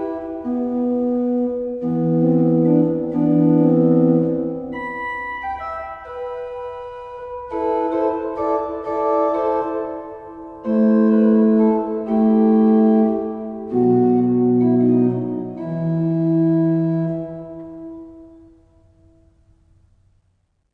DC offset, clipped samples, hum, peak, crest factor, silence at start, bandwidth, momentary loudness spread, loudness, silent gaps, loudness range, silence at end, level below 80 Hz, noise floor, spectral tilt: under 0.1%; under 0.1%; none; -4 dBFS; 14 dB; 0 s; 4.2 kHz; 17 LU; -18 LUFS; none; 9 LU; 2.45 s; -52 dBFS; -65 dBFS; -11 dB/octave